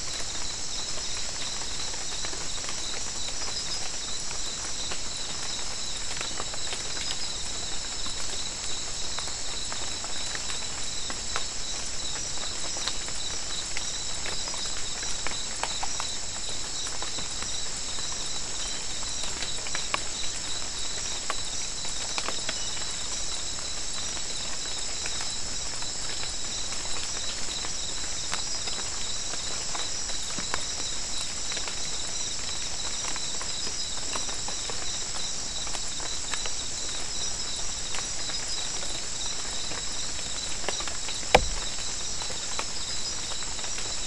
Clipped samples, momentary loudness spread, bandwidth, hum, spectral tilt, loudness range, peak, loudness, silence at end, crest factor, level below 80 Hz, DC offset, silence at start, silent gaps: under 0.1%; 2 LU; 12 kHz; none; -0.5 dB/octave; 2 LU; -4 dBFS; -30 LUFS; 0 s; 28 dB; -44 dBFS; 2%; 0 s; none